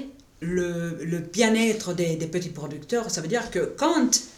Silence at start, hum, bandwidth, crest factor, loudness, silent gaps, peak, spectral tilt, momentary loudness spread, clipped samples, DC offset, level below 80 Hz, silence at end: 0 s; none; 16 kHz; 22 dB; -25 LUFS; none; -4 dBFS; -4 dB/octave; 10 LU; under 0.1%; under 0.1%; -56 dBFS; 0 s